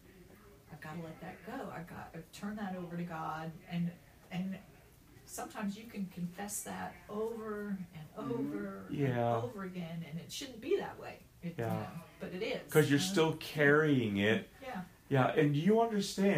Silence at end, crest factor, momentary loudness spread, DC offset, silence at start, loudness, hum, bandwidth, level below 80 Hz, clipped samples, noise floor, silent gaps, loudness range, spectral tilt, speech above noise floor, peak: 0 s; 22 dB; 17 LU; under 0.1%; 0.1 s; -35 LUFS; none; 15.5 kHz; -66 dBFS; under 0.1%; -59 dBFS; none; 11 LU; -5.5 dB/octave; 24 dB; -14 dBFS